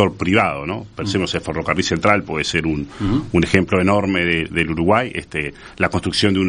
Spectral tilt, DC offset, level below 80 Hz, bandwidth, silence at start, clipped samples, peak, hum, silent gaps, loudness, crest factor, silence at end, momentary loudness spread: -5.5 dB/octave; under 0.1%; -42 dBFS; 10 kHz; 0 s; under 0.1%; 0 dBFS; none; none; -19 LUFS; 18 dB; 0 s; 8 LU